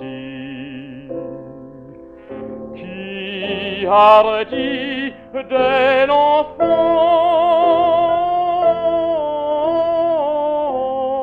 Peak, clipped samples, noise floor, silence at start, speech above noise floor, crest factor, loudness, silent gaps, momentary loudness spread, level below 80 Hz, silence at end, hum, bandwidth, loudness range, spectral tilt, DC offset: 0 dBFS; under 0.1%; -38 dBFS; 0 s; 25 dB; 16 dB; -16 LUFS; none; 18 LU; -52 dBFS; 0 s; none; 5.2 kHz; 13 LU; -6.5 dB/octave; under 0.1%